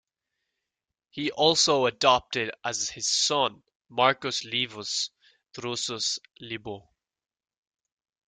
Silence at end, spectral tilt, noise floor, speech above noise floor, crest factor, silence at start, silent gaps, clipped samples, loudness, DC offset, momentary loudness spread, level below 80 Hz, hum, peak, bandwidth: 1.5 s; -2 dB/octave; -87 dBFS; 61 dB; 24 dB; 1.15 s; 3.75-3.80 s; under 0.1%; -25 LUFS; under 0.1%; 16 LU; -66 dBFS; none; -6 dBFS; 11 kHz